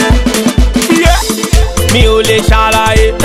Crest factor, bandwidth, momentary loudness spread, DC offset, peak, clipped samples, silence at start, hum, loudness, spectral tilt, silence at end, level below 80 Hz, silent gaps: 8 dB; 15.5 kHz; 4 LU; under 0.1%; 0 dBFS; 1%; 0 s; none; -9 LUFS; -4.5 dB/octave; 0 s; -12 dBFS; none